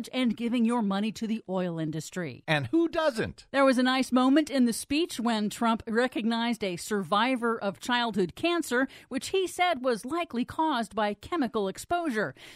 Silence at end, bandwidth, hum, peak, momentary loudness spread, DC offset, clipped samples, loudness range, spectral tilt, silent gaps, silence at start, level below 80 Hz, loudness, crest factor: 0 s; 15.5 kHz; none; -10 dBFS; 8 LU; under 0.1%; under 0.1%; 3 LU; -4.5 dB/octave; none; 0 s; -62 dBFS; -28 LUFS; 18 dB